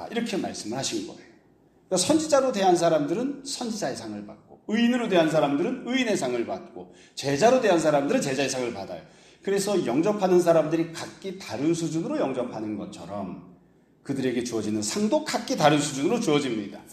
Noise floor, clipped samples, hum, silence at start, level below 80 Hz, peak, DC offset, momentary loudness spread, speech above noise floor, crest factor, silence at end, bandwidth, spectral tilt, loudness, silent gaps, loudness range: -59 dBFS; under 0.1%; none; 0 s; -66 dBFS; -6 dBFS; under 0.1%; 15 LU; 34 dB; 20 dB; 0 s; 14 kHz; -4.5 dB/octave; -25 LUFS; none; 6 LU